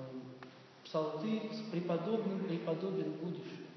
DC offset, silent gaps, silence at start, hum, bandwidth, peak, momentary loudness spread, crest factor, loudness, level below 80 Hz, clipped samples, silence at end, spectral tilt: under 0.1%; none; 0 s; none; 6.2 kHz; -22 dBFS; 15 LU; 18 dB; -39 LUFS; under -90 dBFS; under 0.1%; 0 s; -6.5 dB/octave